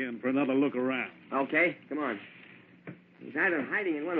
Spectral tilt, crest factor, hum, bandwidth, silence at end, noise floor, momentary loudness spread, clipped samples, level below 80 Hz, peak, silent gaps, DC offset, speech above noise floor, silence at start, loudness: -3.5 dB/octave; 16 dB; none; 4.3 kHz; 0 s; -50 dBFS; 22 LU; under 0.1%; -84 dBFS; -14 dBFS; none; under 0.1%; 20 dB; 0 s; -30 LUFS